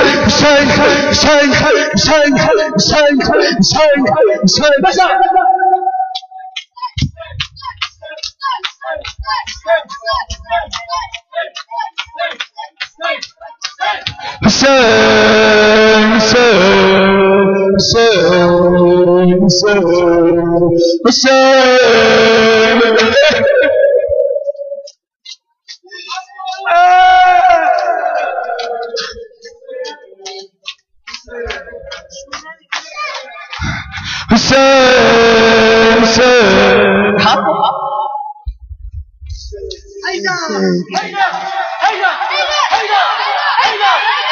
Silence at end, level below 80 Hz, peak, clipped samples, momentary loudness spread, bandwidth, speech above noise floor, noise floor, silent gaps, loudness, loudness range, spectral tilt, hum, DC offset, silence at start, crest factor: 0 s; -36 dBFS; 0 dBFS; under 0.1%; 19 LU; 7.4 kHz; 29 dB; -38 dBFS; 25.16-25.20 s; -10 LUFS; 13 LU; -4 dB/octave; none; under 0.1%; 0 s; 10 dB